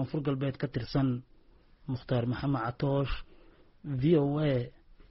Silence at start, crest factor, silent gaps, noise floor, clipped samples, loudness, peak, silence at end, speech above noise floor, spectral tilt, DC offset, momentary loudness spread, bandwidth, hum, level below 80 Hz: 0 s; 18 dB; none; -59 dBFS; under 0.1%; -31 LUFS; -14 dBFS; 0.1 s; 29 dB; -7.5 dB/octave; under 0.1%; 13 LU; 5.8 kHz; none; -48 dBFS